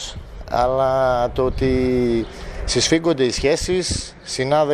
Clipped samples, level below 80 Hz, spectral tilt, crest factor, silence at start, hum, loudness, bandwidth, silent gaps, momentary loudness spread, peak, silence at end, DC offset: under 0.1%; -32 dBFS; -4.5 dB/octave; 16 dB; 0 s; none; -19 LUFS; 14 kHz; none; 10 LU; -4 dBFS; 0 s; under 0.1%